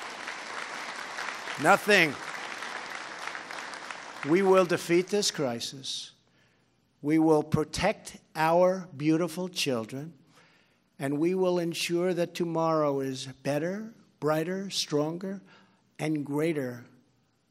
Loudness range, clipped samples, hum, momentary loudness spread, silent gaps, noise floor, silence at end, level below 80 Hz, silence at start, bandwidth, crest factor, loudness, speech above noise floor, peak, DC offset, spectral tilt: 4 LU; under 0.1%; none; 15 LU; none; -68 dBFS; 0.65 s; -62 dBFS; 0 s; 16 kHz; 24 dB; -28 LUFS; 41 dB; -6 dBFS; under 0.1%; -4.5 dB/octave